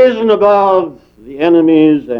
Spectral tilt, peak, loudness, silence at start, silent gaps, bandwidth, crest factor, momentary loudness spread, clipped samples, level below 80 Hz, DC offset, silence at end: -8 dB/octave; 0 dBFS; -10 LUFS; 0 s; none; 5.8 kHz; 10 dB; 7 LU; under 0.1%; -52 dBFS; under 0.1%; 0 s